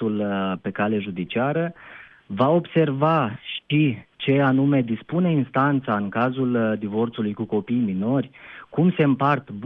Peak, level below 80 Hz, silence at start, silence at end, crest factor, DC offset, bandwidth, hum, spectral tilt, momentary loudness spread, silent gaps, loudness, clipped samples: -6 dBFS; -66 dBFS; 0 s; 0 s; 16 dB; under 0.1%; 5 kHz; none; -10 dB/octave; 8 LU; none; -22 LUFS; under 0.1%